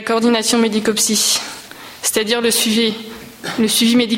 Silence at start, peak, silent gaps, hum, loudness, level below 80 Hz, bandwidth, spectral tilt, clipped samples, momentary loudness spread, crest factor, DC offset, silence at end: 0 s; -2 dBFS; none; none; -15 LUFS; -56 dBFS; 16.5 kHz; -2 dB/octave; under 0.1%; 16 LU; 14 dB; under 0.1%; 0 s